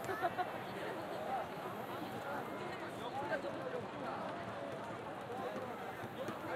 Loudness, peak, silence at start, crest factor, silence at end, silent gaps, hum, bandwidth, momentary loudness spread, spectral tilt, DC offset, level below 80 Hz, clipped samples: -43 LUFS; -24 dBFS; 0 s; 20 dB; 0 s; none; none; 16 kHz; 5 LU; -5.5 dB/octave; under 0.1%; -74 dBFS; under 0.1%